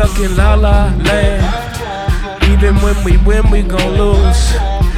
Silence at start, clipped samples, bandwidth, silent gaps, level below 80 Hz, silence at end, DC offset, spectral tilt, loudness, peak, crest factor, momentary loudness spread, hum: 0 s; under 0.1%; 14 kHz; none; -12 dBFS; 0 s; under 0.1%; -6 dB/octave; -13 LUFS; 0 dBFS; 10 dB; 7 LU; none